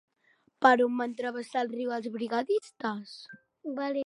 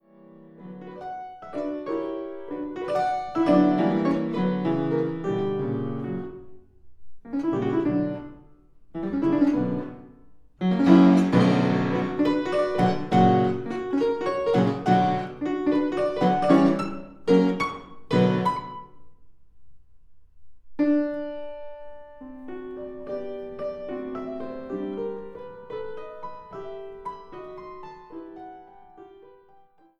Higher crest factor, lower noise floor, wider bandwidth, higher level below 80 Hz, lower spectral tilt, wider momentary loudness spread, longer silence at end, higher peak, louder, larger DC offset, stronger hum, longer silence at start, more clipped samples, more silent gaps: about the same, 22 dB vs 22 dB; first, -69 dBFS vs -56 dBFS; first, 11 kHz vs 9.4 kHz; second, -82 dBFS vs -56 dBFS; second, -5 dB/octave vs -8 dB/octave; about the same, 19 LU vs 21 LU; second, 0 s vs 0.65 s; second, -8 dBFS vs -4 dBFS; second, -29 LUFS vs -24 LUFS; second, under 0.1% vs 0.2%; neither; first, 0.6 s vs 0.25 s; neither; neither